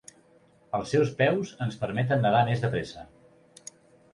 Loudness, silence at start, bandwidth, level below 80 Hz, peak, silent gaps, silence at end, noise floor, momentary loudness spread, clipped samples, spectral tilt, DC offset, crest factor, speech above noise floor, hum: -26 LUFS; 0.75 s; 11.5 kHz; -60 dBFS; -10 dBFS; none; 1.1 s; -60 dBFS; 23 LU; under 0.1%; -6.5 dB/octave; under 0.1%; 18 dB; 34 dB; none